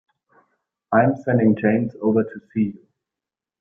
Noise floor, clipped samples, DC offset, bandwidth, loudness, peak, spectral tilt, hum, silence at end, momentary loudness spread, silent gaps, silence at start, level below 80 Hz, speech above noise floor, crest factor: -88 dBFS; under 0.1%; under 0.1%; 3.5 kHz; -20 LUFS; -4 dBFS; -11 dB/octave; none; 0.9 s; 7 LU; none; 0.9 s; -60 dBFS; 69 dB; 18 dB